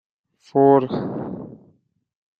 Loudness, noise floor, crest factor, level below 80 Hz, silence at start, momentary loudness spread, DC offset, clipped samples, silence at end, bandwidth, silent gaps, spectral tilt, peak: -19 LUFS; -62 dBFS; 20 dB; -62 dBFS; 0.55 s; 20 LU; under 0.1%; under 0.1%; 0.9 s; 5.6 kHz; none; -10 dB/octave; -4 dBFS